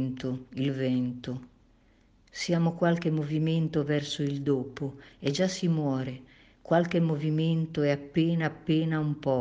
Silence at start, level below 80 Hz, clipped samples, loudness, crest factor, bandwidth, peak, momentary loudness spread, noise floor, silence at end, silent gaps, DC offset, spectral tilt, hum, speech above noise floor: 0 s; -62 dBFS; under 0.1%; -29 LUFS; 18 dB; 8 kHz; -10 dBFS; 10 LU; -62 dBFS; 0 s; none; under 0.1%; -7 dB/octave; none; 34 dB